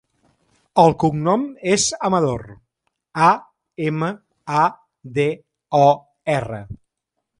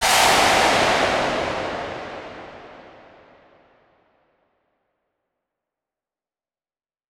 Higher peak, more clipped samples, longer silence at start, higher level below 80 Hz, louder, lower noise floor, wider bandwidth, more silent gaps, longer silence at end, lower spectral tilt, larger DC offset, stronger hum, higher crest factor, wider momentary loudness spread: about the same, -2 dBFS vs -4 dBFS; neither; first, 0.75 s vs 0 s; about the same, -52 dBFS vs -50 dBFS; about the same, -19 LUFS vs -18 LUFS; second, -79 dBFS vs under -90 dBFS; second, 11.5 kHz vs 19 kHz; neither; second, 0.65 s vs 4.3 s; first, -5 dB/octave vs -1.5 dB/octave; neither; neither; about the same, 18 dB vs 20 dB; second, 16 LU vs 24 LU